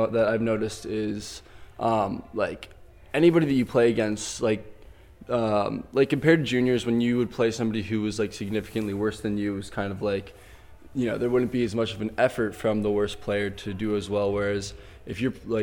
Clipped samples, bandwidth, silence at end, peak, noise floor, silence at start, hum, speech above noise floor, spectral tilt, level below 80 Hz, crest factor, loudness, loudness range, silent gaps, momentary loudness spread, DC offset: under 0.1%; 16.5 kHz; 0 s; -6 dBFS; -48 dBFS; 0 s; none; 23 dB; -6 dB/octave; -52 dBFS; 20 dB; -26 LUFS; 4 LU; none; 10 LU; under 0.1%